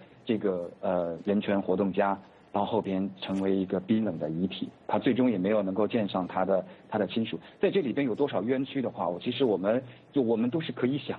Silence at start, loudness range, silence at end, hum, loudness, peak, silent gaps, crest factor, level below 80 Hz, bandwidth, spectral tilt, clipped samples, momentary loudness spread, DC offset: 0 s; 1 LU; 0 s; none; -29 LUFS; -14 dBFS; none; 14 dB; -70 dBFS; 4.9 kHz; -9 dB/octave; under 0.1%; 6 LU; under 0.1%